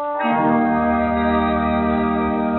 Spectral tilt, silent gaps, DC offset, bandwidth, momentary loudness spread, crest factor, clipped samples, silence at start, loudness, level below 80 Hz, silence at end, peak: -5.5 dB/octave; none; under 0.1%; 4.2 kHz; 2 LU; 12 dB; under 0.1%; 0 s; -18 LUFS; -38 dBFS; 0 s; -6 dBFS